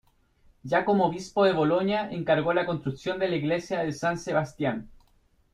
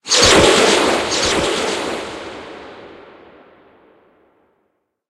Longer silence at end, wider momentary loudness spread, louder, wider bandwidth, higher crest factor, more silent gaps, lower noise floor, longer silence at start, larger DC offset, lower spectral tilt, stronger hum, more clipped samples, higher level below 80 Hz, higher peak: second, 0.65 s vs 2.15 s; second, 7 LU vs 24 LU; second, -26 LUFS vs -13 LUFS; second, 12.5 kHz vs 15.5 kHz; about the same, 18 dB vs 18 dB; neither; second, -64 dBFS vs -68 dBFS; first, 0.65 s vs 0.05 s; neither; first, -6 dB/octave vs -2 dB/octave; neither; neither; second, -58 dBFS vs -40 dBFS; second, -10 dBFS vs 0 dBFS